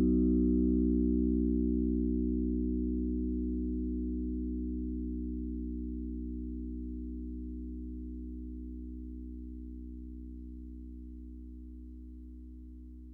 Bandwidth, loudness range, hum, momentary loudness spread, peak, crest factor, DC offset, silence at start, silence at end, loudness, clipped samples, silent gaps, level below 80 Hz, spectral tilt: 1.3 kHz; 16 LU; 60 Hz at -95 dBFS; 20 LU; -20 dBFS; 14 dB; under 0.1%; 0 s; 0 s; -34 LUFS; under 0.1%; none; -40 dBFS; -14.5 dB/octave